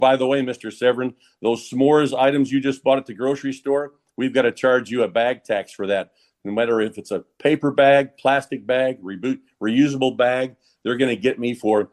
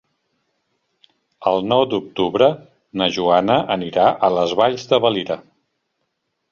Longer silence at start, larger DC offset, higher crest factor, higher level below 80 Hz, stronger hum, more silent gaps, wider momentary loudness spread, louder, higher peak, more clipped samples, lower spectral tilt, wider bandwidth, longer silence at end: second, 0 s vs 1.4 s; neither; about the same, 16 dB vs 18 dB; second, -66 dBFS vs -58 dBFS; neither; neither; about the same, 10 LU vs 8 LU; second, -21 LUFS vs -18 LUFS; about the same, -4 dBFS vs -2 dBFS; neither; about the same, -5.5 dB/octave vs -5.5 dB/octave; first, 12 kHz vs 7.2 kHz; second, 0.05 s vs 1.1 s